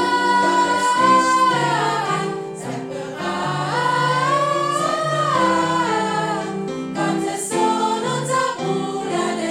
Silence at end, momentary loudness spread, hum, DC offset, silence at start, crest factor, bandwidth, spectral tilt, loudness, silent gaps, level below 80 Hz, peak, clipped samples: 0 s; 10 LU; none; under 0.1%; 0 s; 16 dB; 16 kHz; -4 dB/octave; -19 LUFS; none; -66 dBFS; -4 dBFS; under 0.1%